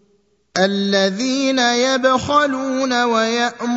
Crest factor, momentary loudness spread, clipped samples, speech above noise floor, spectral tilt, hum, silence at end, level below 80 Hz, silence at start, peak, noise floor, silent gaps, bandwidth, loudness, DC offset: 16 dB; 4 LU; under 0.1%; 43 dB; -3.5 dB/octave; none; 0 s; -58 dBFS; 0.55 s; -2 dBFS; -60 dBFS; none; 8 kHz; -17 LUFS; under 0.1%